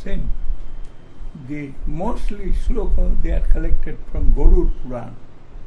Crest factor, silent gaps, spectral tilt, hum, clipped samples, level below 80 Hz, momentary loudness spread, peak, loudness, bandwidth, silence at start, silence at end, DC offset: 14 dB; none; -8.5 dB/octave; none; under 0.1%; -18 dBFS; 20 LU; 0 dBFS; -25 LUFS; 2.7 kHz; 0 s; 0.05 s; under 0.1%